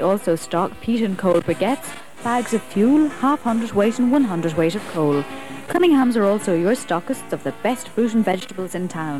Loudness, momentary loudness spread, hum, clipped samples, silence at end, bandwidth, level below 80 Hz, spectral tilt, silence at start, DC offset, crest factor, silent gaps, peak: -20 LUFS; 10 LU; none; under 0.1%; 0 s; 15.5 kHz; -56 dBFS; -6 dB/octave; 0 s; 1%; 14 dB; none; -6 dBFS